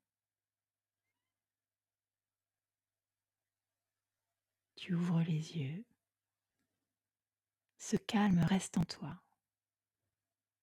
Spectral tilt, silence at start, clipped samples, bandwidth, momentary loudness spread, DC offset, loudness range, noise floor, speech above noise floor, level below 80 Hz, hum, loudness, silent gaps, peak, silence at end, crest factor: -6 dB/octave; 4.75 s; under 0.1%; 13 kHz; 18 LU; under 0.1%; 4 LU; under -90 dBFS; over 55 dB; -70 dBFS; none; -36 LUFS; none; -22 dBFS; 1.45 s; 20 dB